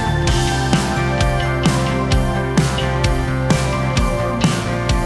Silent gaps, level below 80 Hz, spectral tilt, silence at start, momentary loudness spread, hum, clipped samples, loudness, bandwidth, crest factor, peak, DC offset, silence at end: none; -24 dBFS; -5.5 dB/octave; 0 s; 2 LU; none; under 0.1%; -18 LUFS; 12 kHz; 16 dB; -2 dBFS; under 0.1%; 0 s